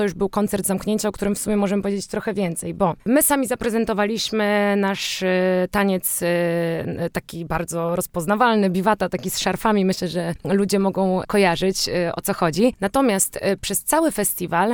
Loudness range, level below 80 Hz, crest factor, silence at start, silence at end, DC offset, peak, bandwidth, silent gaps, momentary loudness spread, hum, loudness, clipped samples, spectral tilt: 2 LU; -46 dBFS; 16 dB; 0 s; 0 s; under 0.1%; -4 dBFS; over 20 kHz; none; 7 LU; none; -21 LUFS; under 0.1%; -4.5 dB/octave